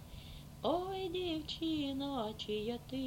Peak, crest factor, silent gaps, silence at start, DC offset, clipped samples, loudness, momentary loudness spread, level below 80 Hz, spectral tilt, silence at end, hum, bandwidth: -22 dBFS; 18 dB; none; 0 s; under 0.1%; under 0.1%; -39 LUFS; 8 LU; -56 dBFS; -5.5 dB/octave; 0 s; none; 16.5 kHz